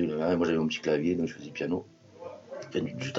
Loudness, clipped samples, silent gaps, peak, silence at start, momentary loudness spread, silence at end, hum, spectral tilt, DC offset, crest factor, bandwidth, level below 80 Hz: -30 LUFS; under 0.1%; none; -14 dBFS; 0 s; 17 LU; 0 s; none; -6 dB/octave; under 0.1%; 16 dB; 7.6 kHz; -64 dBFS